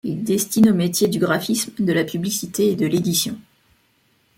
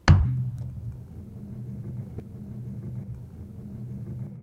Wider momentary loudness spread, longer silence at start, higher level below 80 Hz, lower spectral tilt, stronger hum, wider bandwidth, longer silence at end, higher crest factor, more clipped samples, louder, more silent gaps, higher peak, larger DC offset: second, 7 LU vs 14 LU; about the same, 0.05 s vs 0.05 s; second, -60 dBFS vs -36 dBFS; second, -4.5 dB/octave vs -7 dB/octave; neither; first, 17 kHz vs 8 kHz; first, 0.95 s vs 0 s; second, 16 dB vs 24 dB; neither; first, -20 LUFS vs -32 LUFS; neither; about the same, -4 dBFS vs -4 dBFS; neither